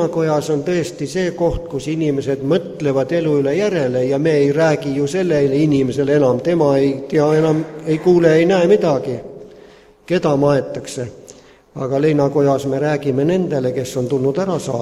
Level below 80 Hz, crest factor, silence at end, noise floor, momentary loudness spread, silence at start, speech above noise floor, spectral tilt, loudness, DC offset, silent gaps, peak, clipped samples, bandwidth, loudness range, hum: -44 dBFS; 16 dB; 0 s; -44 dBFS; 8 LU; 0 s; 28 dB; -7 dB/octave; -17 LUFS; under 0.1%; none; 0 dBFS; under 0.1%; 13.5 kHz; 4 LU; none